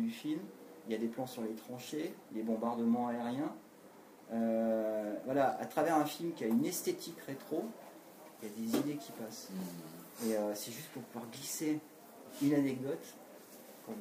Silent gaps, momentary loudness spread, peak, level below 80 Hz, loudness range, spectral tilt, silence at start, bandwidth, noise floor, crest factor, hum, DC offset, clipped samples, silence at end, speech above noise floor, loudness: none; 20 LU; -18 dBFS; -84 dBFS; 6 LU; -5 dB/octave; 0 s; 15.5 kHz; -58 dBFS; 20 dB; none; under 0.1%; under 0.1%; 0 s; 21 dB; -37 LUFS